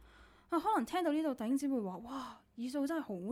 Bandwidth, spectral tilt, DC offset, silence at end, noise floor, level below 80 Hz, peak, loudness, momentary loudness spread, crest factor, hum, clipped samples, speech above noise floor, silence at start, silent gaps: 16 kHz; -5.5 dB/octave; under 0.1%; 0 s; -61 dBFS; -70 dBFS; -22 dBFS; -37 LUFS; 11 LU; 16 dB; none; under 0.1%; 25 dB; 0 s; none